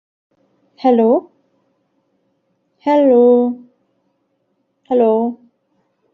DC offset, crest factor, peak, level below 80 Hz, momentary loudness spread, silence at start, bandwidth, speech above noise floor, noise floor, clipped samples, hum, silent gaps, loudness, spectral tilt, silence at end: under 0.1%; 16 dB; -2 dBFS; -68 dBFS; 14 LU; 0.85 s; 4.7 kHz; 54 dB; -66 dBFS; under 0.1%; none; none; -14 LUFS; -8.5 dB/octave; 0.8 s